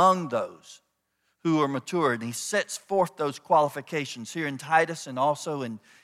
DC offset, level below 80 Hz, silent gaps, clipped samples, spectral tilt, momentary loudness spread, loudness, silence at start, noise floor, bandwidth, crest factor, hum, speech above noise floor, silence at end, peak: under 0.1%; -80 dBFS; none; under 0.1%; -4.5 dB/octave; 9 LU; -27 LUFS; 0 s; -75 dBFS; 16 kHz; 20 dB; none; 48 dB; 0.25 s; -8 dBFS